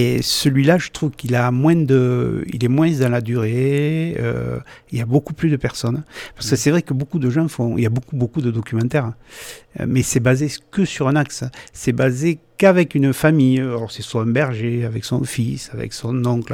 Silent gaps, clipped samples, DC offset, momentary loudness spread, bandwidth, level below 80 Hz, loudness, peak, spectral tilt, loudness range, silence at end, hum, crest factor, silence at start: none; under 0.1%; under 0.1%; 12 LU; 17.5 kHz; -46 dBFS; -19 LUFS; -2 dBFS; -6 dB/octave; 3 LU; 0 s; none; 16 dB; 0 s